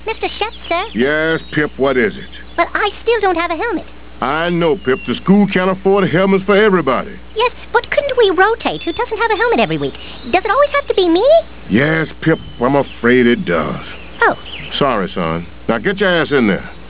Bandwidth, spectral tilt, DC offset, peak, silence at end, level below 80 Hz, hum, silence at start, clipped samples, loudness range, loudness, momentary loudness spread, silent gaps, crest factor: 4 kHz; -9.5 dB/octave; 2%; 0 dBFS; 0 s; -38 dBFS; none; 0 s; under 0.1%; 3 LU; -15 LUFS; 9 LU; none; 16 dB